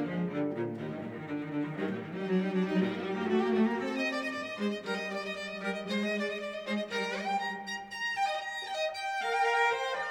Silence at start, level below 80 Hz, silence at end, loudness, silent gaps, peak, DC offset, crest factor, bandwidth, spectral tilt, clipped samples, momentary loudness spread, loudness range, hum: 0 s; -76 dBFS; 0 s; -33 LUFS; none; -16 dBFS; under 0.1%; 16 dB; 16.5 kHz; -5.5 dB/octave; under 0.1%; 8 LU; 3 LU; none